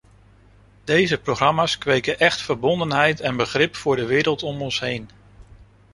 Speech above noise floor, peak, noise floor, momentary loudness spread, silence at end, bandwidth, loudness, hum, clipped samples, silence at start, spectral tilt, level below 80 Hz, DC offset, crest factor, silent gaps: 31 dB; -2 dBFS; -52 dBFS; 6 LU; 0.3 s; 11.5 kHz; -20 LUFS; 50 Hz at -45 dBFS; under 0.1%; 0.85 s; -4.5 dB/octave; -52 dBFS; under 0.1%; 20 dB; none